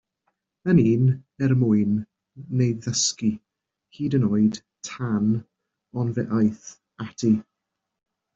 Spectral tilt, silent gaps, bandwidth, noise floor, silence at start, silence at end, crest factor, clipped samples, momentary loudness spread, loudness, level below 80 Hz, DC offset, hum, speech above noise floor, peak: -6 dB/octave; none; 8 kHz; -83 dBFS; 0.65 s; 0.95 s; 18 dB; under 0.1%; 17 LU; -23 LUFS; -60 dBFS; under 0.1%; none; 61 dB; -6 dBFS